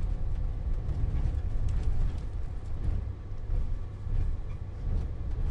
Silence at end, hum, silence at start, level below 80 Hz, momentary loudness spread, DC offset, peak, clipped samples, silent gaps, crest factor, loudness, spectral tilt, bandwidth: 0 s; none; 0 s; -30 dBFS; 6 LU; under 0.1%; -16 dBFS; under 0.1%; none; 14 dB; -35 LUFS; -8.5 dB/octave; 4.8 kHz